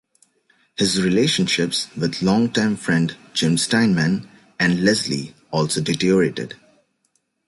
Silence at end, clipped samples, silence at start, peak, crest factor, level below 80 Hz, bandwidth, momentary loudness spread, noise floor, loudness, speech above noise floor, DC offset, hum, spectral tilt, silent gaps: 0.9 s; under 0.1%; 0.8 s; -4 dBFS; 16 dB; -54 dBFS; 11.5 kHz; 8 LU; -69 dBFS; -20 LUFS; 49 dB; under 0.1%; none; -4.5 dB/octave; none